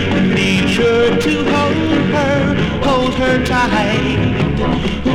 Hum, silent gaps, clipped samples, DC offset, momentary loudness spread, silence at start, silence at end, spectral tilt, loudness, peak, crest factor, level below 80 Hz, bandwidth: none; none; under 0.1%; under 0.1%; 3 LU; 0 s; 0 s; -6 dB/octave; -14 LUFS; -2 dBFS; 12 dB; -30 dBFS; 13.5 kHz